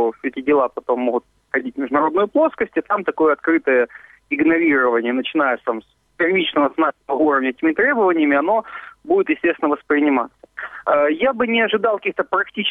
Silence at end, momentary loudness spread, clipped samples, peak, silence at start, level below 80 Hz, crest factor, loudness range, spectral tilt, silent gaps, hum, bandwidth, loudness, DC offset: 0 s; 8 LU; under 0.1%; -4 dBFS; 0 s; -60 dBFS; 14 dB; 1 LU; -7 dB/octave; none; none; 3.9 kHz; -18 LUFS; under 0.1%